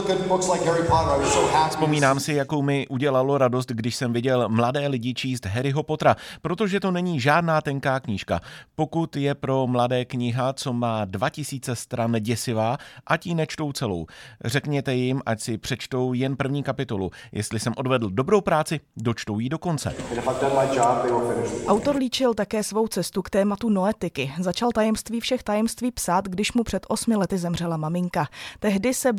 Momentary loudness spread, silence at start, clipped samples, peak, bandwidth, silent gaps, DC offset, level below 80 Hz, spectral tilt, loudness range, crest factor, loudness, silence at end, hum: 8 LU; 0 s; under 0.1%; -4 dBFS; 18 kHz; none; under 0.1%; -50 dBFS; -5.5 dB/octave; 4 LU; 20 dB; -24 LUFS; 0 s; none